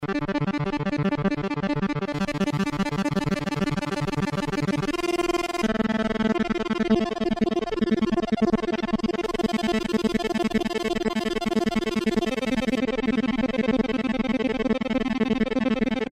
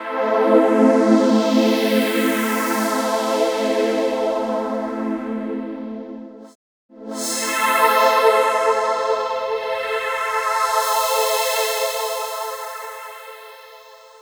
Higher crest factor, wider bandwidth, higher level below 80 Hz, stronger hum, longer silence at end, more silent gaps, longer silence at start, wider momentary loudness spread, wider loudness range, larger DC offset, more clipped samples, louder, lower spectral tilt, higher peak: about the same, 14 dB vs 18 dB; second, 13.5 kHz vs over 20 kHz; first, -44 dBFS vs -64 dBFS; neither; second, 0.05 s vs 0.25 s; second, none vs 6.55-6.89 s; about the same, 0 s vs 0 s; second, 3 LU vs 17 LU; second, 2 LU vs 7 LU; neither; neither; second, -25 LUFS vs -19 LUFS; first, -6 dB/octave vs -3 dB/octave; second, -12 dBFS vs -2 dBFS